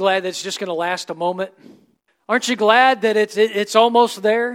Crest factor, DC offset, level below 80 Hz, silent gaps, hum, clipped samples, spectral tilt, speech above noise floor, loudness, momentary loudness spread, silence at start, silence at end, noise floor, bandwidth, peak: 18 dB; under 0.1%; -72 dBFS; none; none; under 0.1%; -3 dB/octave; 27 dB; -17 LUFS; 11 LU; 0 s; 0 s; -44 dBFS; 16.5 kHz; 0 dBFS